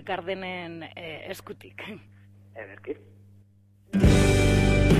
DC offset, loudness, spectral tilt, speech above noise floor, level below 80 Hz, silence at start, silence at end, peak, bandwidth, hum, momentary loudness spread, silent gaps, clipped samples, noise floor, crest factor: under 0.1%; -23 LUFS; -6 dB/octave; 21 dB; -32 dBFS; 0.05 s; 0 s; -8 dBFS; 15 kHz; 50 Hz at -50 dBFS; 22 LU; none; under 0.1%; -58 dBFS; 18 dB